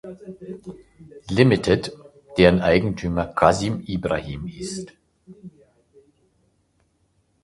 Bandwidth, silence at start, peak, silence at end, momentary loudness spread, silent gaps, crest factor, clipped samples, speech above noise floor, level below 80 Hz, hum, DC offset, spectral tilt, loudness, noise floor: 11.5 kHz; 0.05 s; 0 dBFS; 1.95 s; 22 LU; none; 24 dB; under 0.1%; 45 dB; -44 dBFS; none; under 0.1%; -6 dB/octave; -21 LUFS; -66 dBFS